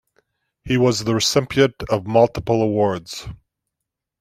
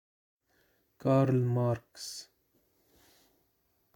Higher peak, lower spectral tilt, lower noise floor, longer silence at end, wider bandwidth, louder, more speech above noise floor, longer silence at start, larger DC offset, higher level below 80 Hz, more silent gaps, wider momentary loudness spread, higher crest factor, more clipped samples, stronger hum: first, -2 dBFS vs -14 dBFS; second, -5 dB/octave vs -7 dB/octave; first, -83 dBFS vs -74 dBFS; second, 0.85 s vs 1.75 s; about the same, 16 kHz vs 16.5 kHz; first, -19 LUFS vs -30 LUFS; first, 64 dB vs 45 dB; second, 0.65 s vs 1.05 s; neither; first, -46 dBFS vs -70 dBFS; neither; second, 12 LU vs 16 LU; about the same, 18 dB vs 20 dB; neither; neither